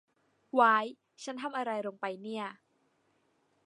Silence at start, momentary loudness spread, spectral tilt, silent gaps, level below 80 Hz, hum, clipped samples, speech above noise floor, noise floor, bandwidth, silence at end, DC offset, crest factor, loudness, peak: 0.55 s; 17 LU; -4 dB/octave; none; under -90 dBFS; none; under 0.1%; 42 dB; -73 dBFS; 11.5 kHz; 1.15 s; under 0.1%; 24 dB; -31 LUFS; -10 dBFS